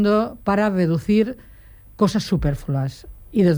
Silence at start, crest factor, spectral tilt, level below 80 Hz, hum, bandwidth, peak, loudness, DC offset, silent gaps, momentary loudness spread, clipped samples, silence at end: 0 s; 14 dB; -7.5 dB/octave; -38 dBFS; none; over 20 kHz; -6 dBFS; -21 LUFS; under 0.1%; none; 8 LU; under 0.1%; 0 s